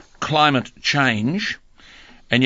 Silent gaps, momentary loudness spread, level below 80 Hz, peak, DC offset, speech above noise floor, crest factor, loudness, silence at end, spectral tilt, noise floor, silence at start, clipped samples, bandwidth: none; 9 LU; -52 dBFS; 0 dBFS; under 0.1%; 27 dB; 20 dB; -19 LUFS; 0 s; -4.5 dB/octave; -46 dBFS; 0.2 s; under 0.1%; 7.8 kHz